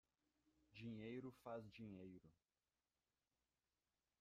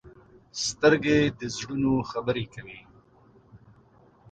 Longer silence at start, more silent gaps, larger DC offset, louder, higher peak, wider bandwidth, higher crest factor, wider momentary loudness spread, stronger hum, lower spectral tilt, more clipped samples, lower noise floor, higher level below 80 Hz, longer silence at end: first, 0.7 s vs 0.05 s; neither; neither; second, -57 LUFS vs -25 LUFS; second, -42 dBFS vs -6 dBFS; about the same, 9.6 kHz vs 9.2 kHz; about the same, 18 dB vs 22 dB; second, 11 LU vs 19 LU; neither; first, -7.5 dB/octave vs -4.5 dB/octave; neither; first, under -90 dBFS vs -58 dBFS; second, -86 dBFS vs -54 dBFS; first, 1.9 s vs 0.75 s